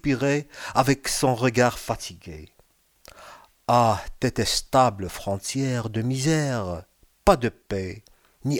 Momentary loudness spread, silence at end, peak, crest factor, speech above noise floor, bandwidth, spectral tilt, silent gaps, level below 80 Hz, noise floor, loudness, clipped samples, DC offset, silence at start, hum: 15 LU; 0 s; -2 dBFS; 22 dB; 38 dB; 19.5 kHz; -5 dB/octave; none; -44 dBFS; -62 dBFS; -24 LUFS; under 0.1%; under 0.1%; 0.05 s; none